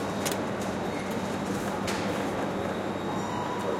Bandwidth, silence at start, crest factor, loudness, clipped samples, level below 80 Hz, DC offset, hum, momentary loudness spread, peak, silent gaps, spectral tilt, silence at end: 16.5 kHz; 0 s; 16 dB; -31 LUFS; under 0.1%; -56 dBFS; under 0.1%; none; 2 LU; -14 dBFS; none; -5 dB/octave; 0 s